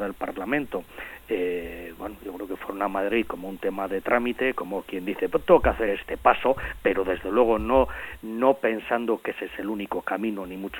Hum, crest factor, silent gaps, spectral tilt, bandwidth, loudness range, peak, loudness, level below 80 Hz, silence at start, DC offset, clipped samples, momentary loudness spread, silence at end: none; 22 dB; none; -6.5 dB/octave; 17 kHz; 7 LU; -4 dBFS; -26 LUFS; -44 dBFS; 0 s; under 0.1%; under 0.1%; 13 LU; 0 s